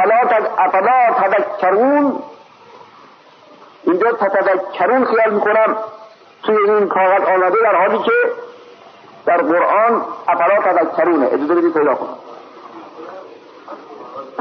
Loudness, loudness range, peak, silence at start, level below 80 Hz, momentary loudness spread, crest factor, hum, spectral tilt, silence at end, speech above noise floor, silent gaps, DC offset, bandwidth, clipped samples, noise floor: -14 LUFS; 4 LU; -4 dBFS; 0 s; -72 dBFS; 20 LU; 12 dB; none; -7.5 dB/octave; 0 s; 30 dB; none; under 0.1%; 6.2 kHz; under 0.1%; -44 dBFS